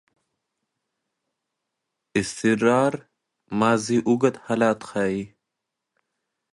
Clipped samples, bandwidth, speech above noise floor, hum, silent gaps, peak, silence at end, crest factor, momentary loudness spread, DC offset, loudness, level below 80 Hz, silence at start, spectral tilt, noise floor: under 0.1%; 11.5 kHz; 61 dB; none; none; -4 dBFS; 1.25 s; 20 dB; 11 LU; under 0.1%; -23 LUFS; -62 dBFS; 2.15 s; -5.5 dB/octave; -83 dBFS